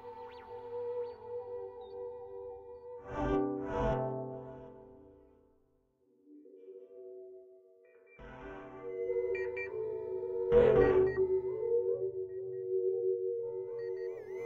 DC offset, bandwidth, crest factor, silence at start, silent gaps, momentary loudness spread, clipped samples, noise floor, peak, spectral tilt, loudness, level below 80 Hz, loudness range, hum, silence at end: under 0.1%; 6.4 kHz; 22 dB; 0 s; none; 22 LU; under 0.1%; -72 dBFS; -14 dBFS; -9 dB/octave; -34 LUFS; -54 dBFS; 22 LU; none; 0 s